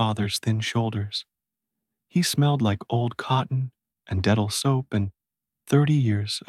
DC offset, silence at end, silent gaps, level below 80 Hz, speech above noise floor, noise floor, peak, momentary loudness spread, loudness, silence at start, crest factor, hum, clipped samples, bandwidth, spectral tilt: under 0.1%; 0.1 s; none; -56 dBFS; 64 dB; -87 dBFS; -8 dBFS; 8 LU; -24 LUFS; 0 s; 18 dB; none; under 0.1%; 15 kHz; -5.5 dB/octave